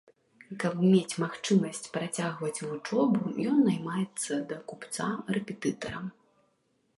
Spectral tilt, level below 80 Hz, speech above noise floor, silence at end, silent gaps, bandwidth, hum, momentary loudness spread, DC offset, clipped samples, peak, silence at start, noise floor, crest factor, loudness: -5.5 dB/octave; -70 dBFS; 43 dB; 0.9 s; none; 11.5 kHz; none; 12 LU; under 0.1%; under 0.1%; -12 dBFS; 0.5 s; -73 dBFS; 18 dB; -30 LUFS